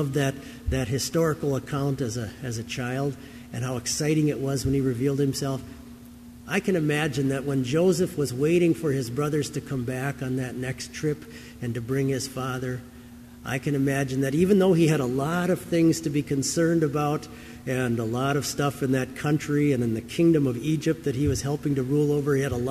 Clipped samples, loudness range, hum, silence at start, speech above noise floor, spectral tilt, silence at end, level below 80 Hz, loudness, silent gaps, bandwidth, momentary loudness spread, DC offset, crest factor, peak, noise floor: under 0.1%; 6 LU; none; 0 s; 20 dB; -6 dB/octave; 0 s; -48 dBFS; -25 LUFS; none; 15 kHz; 11 LU; under 0.1%; 16 dB; -8 dBFS; -45 dBFS